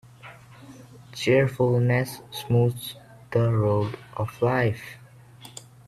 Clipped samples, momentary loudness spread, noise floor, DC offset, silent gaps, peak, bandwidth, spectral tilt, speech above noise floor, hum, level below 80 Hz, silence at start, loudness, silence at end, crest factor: under 0.1%; 21 LU; -48 dBFS; under 0.1%; none; -8 dBFS; 14 kHz; -7 dB/octave; 24 dB; none; -58 dBFS; 0.25 s; -24 LUFS; 0.4 s; 18 dB